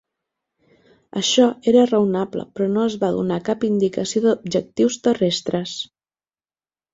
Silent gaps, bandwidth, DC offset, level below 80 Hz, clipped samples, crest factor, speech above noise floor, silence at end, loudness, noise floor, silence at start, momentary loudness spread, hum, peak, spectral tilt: none; 7.8 kHz; under 0.1%; -60 dBFS; under 0.1%; 18 dB; over 71 dB; 1.1 s; -20 LUFS; under -90 dBFS; 1.15 s; 9 LU; none; -2 dBFS; -5 dB/octave